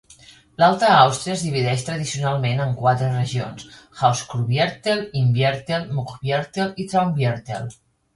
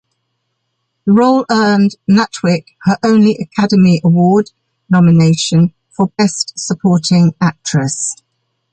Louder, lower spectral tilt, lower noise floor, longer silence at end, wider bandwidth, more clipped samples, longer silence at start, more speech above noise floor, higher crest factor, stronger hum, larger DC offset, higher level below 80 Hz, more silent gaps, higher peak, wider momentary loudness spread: second, -21 LUFS vs -12 LUFS; about the same, -5.5 dB/octave vs -6 dB/octave; second, -49 dBFS vs -69 dBFS; second, 0.4 s vs 0.6 s; first, 11.5 kHz vs 9.4 kHz; neither; second, 0.6 s vs 1.05 s; second, 28 dB vs 58 dB; first, 20 dB vs 12 dB; neither; neither; about the same, -54 dBFS vs -52 dBFS; neither; about the same, 0 dBFS vs -2 dBFS; first, 12 LU vs 8 LU